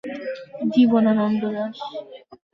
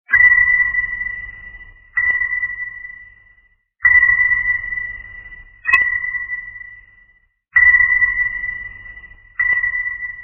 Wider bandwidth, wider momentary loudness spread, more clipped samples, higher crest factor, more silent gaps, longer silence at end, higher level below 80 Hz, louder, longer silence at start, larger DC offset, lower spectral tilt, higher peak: first, 6 kHz vs 4.3 kHz; second, 17 LU vs 23 LU; neither; about the same, 16 dB vs 18 dB; neither; first, 0.2 s vs 0 s; second, -66 dBFS vs -44 dBFS; second, -21 LUFS vs -14 LUFS; about the same, 0.05 s vs 0.1 s; neither; first, -8 dB/octave vs -3.5 dB/octave; second, -6 dBFS vs 0 dBFS